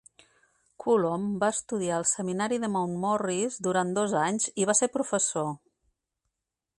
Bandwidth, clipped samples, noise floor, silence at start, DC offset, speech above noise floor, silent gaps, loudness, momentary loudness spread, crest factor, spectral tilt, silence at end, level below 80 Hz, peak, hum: 11.5 kHz; under 0.1%; -85 dBFS; 0.8 s; under 0.1%; 58 dB; none; -27 LUFS; 5 LU; 18 dB; -4 dB/octave; 1.2 s; -70 dBFS; -12 dBFS; none